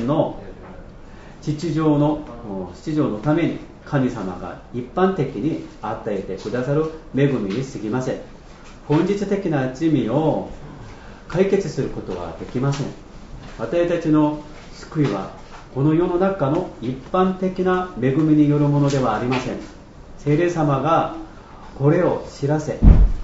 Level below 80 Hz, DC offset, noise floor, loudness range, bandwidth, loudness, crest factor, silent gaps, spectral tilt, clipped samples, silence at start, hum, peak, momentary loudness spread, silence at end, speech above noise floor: -28 dBFS; under 0.1%; -40 dBFS; 5 LU; 8 kHz; -21 LUFS; 20 dB; none; -8 dB/octave; under 0.1%; 0 s; none; 0 dBFS; 19 LU; 0 s; 21 dB